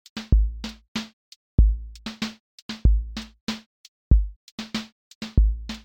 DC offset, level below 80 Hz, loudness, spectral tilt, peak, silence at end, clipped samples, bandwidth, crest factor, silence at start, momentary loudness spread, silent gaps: under 0.1%; -24 dBFS; -26 LUFS; -6 dB/octave; -4 dBFS; 0.05 s; under 0.1%; 8.2 kHz; 20 dB; 0.15 s; 15 LU; 0.88-0.95 s, 1.13-1.58 s, 2.40-2.69 s, 3.41-3.47 s, 3.66-4.11 s, 4.36-4.58 s, 4.92-5.21 s